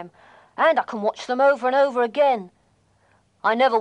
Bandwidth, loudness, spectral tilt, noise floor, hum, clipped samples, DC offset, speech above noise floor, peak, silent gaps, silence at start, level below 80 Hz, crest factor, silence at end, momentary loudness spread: 9.6 kHz; -21 LUFS; -4.5 dB/octave; -62 dBFS; none; under 0.1%; under 0.1%; 42 dB; -6 dBFS; none; 0 s; -74 dBFS; 16 dB; 0 s; 8 LU